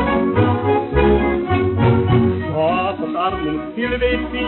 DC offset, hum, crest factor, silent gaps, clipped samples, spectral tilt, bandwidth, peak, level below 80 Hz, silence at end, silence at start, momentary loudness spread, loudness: under 0.1%; none; 14 dB; none; under 0.1%; -6 dB/octave; 4.3 kHz; -2 dBFS; -30 dBFS; 0 s; 0 s; 6 LU; -18 LUFS